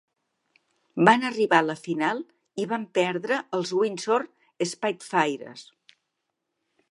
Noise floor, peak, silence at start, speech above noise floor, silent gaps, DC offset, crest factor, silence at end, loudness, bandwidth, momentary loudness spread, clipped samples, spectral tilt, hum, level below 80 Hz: -81 dBFS; -2 dBFS; 0.95 s; 56 dB; none; under 0.1%; 26 dB; 1.3 s; -25 LUFS; 11.5 kHz; 16 LU; under 0.1%; -4.5 dB/octave; none; -78 dBFS